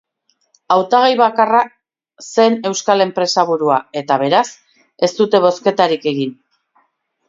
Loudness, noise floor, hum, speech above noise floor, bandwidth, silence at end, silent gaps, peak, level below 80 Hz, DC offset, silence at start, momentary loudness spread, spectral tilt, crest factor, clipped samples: -15 LUFS; -65 dBFS; none; 50 dB; 7.8 kHz; 0.95 s; none; 0 dBFS; -66 dBFS; under 0.1%; 0.7 s; 8 LU; -4 dB/octave; 16 dB; under 0.1%